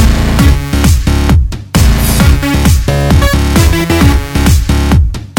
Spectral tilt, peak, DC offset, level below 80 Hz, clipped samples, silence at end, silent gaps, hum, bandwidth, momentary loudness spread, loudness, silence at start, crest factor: -5.5 dB/octave; 0 dBFS; under 0.1%; -10 dBFS; 0.6%; 0 s; none; none; 18.5 kHz; 2 LU; -9 LUFS; 0 s; 8 dB